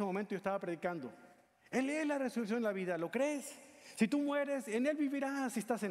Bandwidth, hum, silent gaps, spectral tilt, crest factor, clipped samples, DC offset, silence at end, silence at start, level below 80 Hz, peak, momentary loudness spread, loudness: 15.5 kHz; none; none; -5.5 dB/octave; 18 dB; under 0.1%; under 0.1%; 0 s; 0 s; -80 dBFS; -18 dBFS; 8 LU; -37 LUFS